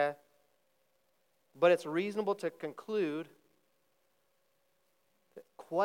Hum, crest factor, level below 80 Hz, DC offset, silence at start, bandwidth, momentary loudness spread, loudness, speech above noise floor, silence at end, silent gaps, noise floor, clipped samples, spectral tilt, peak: none; 22 dB; under -90 dBFS; under 0.1%; 0 s; 16 kHz; 20 LU; -33 LUFS; 44 dB; 0 s; none; -77 dBFS; under 0.1%; -6 dB/octave; -14 dBFS